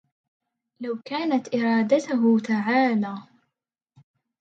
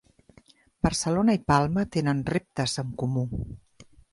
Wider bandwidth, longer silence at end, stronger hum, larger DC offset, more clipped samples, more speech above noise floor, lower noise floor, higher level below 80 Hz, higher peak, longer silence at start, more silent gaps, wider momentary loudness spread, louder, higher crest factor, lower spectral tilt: second, 7.8 kHz vs 11.5 kHz; first, 1.2 s vs 0.3 s; neither; neither; neither; first, 61 dB vs 33 dB; first, -84 dBFS vs -58 dBFS; second, -76 dBFS vs -46 dBFS; about the same, -8 dBFS vs -6 dBFS; about the same, 0.8 s vs 0.85 s; neither; about the same, 12 LU vs 10 LU; first, -23 LUFS vs -26 LUFS; about the same, 18 dB vs 20 dB; about the same, -6 dB/octave vs -5.5 dB/octave